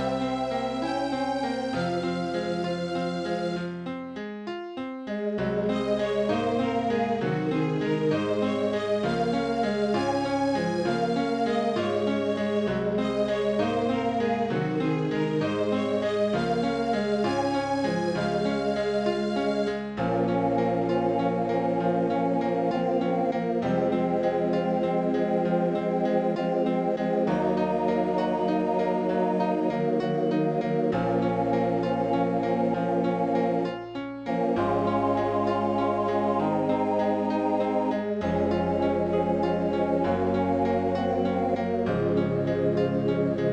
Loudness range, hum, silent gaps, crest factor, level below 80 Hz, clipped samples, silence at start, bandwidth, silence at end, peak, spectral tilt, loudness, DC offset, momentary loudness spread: 3 LU; none; none; 14 dB; -56 dBFS; under 0.1%; 0 s; 10.5 kHz; 0 s; -12 dBFS; -7.5 dB/octave; -26 LUFS; under 0.1%; 4 LU